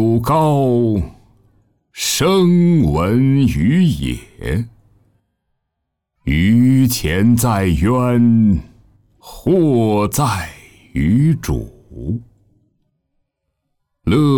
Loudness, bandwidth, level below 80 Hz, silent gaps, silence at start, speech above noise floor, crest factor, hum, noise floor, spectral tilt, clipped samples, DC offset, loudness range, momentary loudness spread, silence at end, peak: -15 LUFS; over 20 kHz; -34 dBFS; none; 0 s; 62 dB; 12 dB; none; -76 dBFS; -6.5 dB/octave; under 0.1%; under 0.1%; 6 LU; 13 LU; 0 s; -4 dBFS